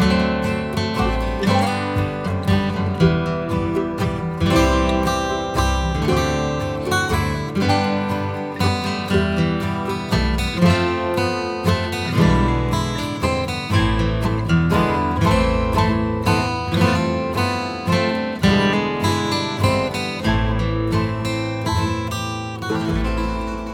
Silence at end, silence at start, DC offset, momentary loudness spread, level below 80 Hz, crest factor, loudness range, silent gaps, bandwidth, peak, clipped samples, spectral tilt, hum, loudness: 0 s; 0 s; under 0.1%; 6 LU; -30 dBFS; 18 dB; 2 LU; none; 17.5 kHz; -2 dBFS; under 0.1%; -6 dB/octave; none; -20 LUFS